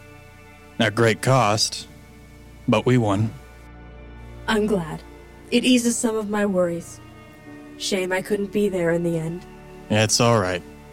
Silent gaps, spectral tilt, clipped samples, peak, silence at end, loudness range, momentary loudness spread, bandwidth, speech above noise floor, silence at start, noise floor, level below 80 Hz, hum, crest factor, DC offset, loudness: none; -4.5 dB/octave; under 0.1%; -6 dBFS; 0 s; 3 LU; 24 LU; 16.5 kHz; 25 dB; 0.05 s; -45 dBFS; -48 dBFS; none; 16 dB; under 0.1%; -21 LUFS